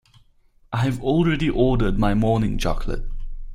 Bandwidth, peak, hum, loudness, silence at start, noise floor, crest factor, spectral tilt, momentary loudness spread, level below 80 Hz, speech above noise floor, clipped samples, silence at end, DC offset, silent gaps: 12.5 kHz; -6 dBFS; none; -22 LUFS; 0.7 s; -56 dBFS; 16 dB; -7.5 dB/octave; 12 LU; -28 dBFS; 36 dB; under 0.1%; 0 s; under 0.1%; none